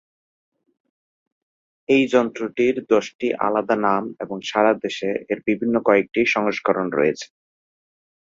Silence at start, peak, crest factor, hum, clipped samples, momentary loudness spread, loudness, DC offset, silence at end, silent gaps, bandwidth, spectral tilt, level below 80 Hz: 1.9 s; -2 dBFS; 20 dB; none; under 0.1%; 8 LU; -21 LUFS; under 0.1%; 1.1 s; 3.15-3.19 s; 7.6 kHz; -5 dB/octave; -64 dBFS